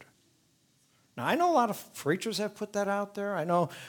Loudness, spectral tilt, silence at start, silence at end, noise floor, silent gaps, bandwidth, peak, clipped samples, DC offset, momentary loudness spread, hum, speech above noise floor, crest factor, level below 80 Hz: -30 LUFS; -5 dB/octave; 0 s; 0 s; -69 dBFS; none; 19.5 kHz; -12 dBFS; under 0.1%; under 0.1%; 9 LU; none; 39 dB; 18 dB; -80 dBFS